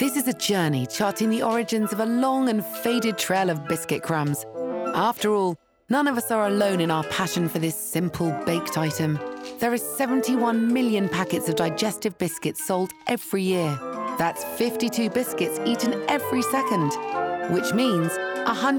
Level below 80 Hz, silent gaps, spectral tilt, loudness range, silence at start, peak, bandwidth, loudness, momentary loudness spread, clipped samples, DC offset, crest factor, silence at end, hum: -66 dBFS; none; -5 dB/octave; 2 LU; 0 s; -10 dBFS; over 20 kHz; -24 LUFS; 5 LU; under 0.1%; under 0.1%; 14 dB; 0 s; none